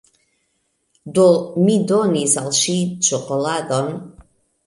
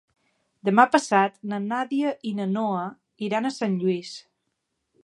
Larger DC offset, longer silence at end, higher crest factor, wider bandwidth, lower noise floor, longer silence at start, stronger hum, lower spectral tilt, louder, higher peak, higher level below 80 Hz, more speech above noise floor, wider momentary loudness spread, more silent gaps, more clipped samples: neither; second, 0.45 s vs 0.85 s; second, 16 dB vs 22 dB; about the same, 11.5 kHz vs 11.5 kHz; second, -68 dBFS vs -78 dBFS; first, 1.05 s vs 0.65 s; neither; second, -4 dB/octave vs -5.5 dB/octave; first, -17 LUFS vs -24 LUFS; about the same, -2 dBFS vs -2 dBFS; first, -58 dBFS vs -78 dBFS; about the same, 51 dB vs 54 dB; second, 8 LU vs 13 LU; neither; neither